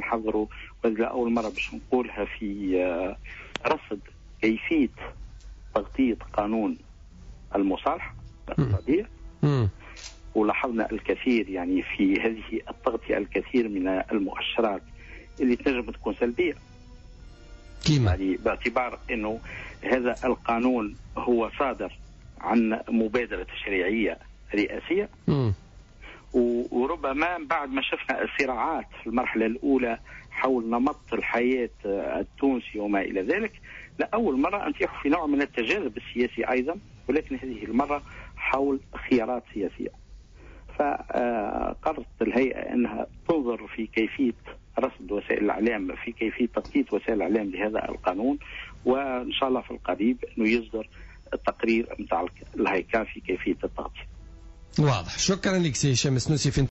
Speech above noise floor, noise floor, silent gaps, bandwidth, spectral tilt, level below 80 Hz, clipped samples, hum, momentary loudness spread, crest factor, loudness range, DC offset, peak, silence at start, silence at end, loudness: 21 dB; -47 dBFS; none; 7.6 kHz; -5 dB/octave; -48 dBFS; under 0.1%; none; 10 LU; 16 dB; 2 LU; under 0.1%; -12 dBFS; 0 s; 0 s; -27 LUFS